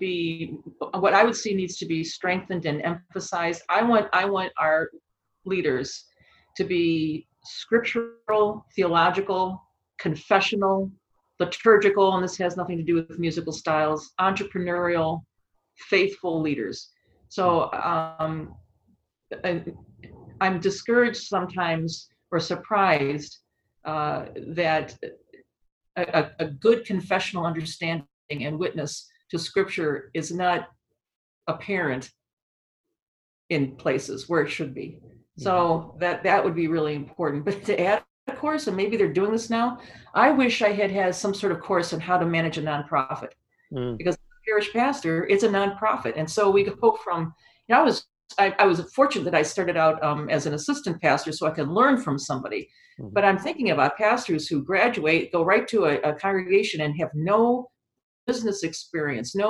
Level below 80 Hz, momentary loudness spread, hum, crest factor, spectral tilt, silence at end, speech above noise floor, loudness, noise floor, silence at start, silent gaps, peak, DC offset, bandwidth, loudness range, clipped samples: -62 dBFS; 12 LU; none; 22 dB; -5 dB/octave; 0 s; 43 dB; -24 LUFS; -67 dBFS; 0 s; 25.72-25.81 s, 28.13-28.29 s, 31.16-31.41 s, 32.33-32.84 s, 33.02-33.49 s, 38.10-38.27 s, 58.03-58.27 s; -2 dBFS; under 0.1%; 12 kHz; 6 LU; under 0.1%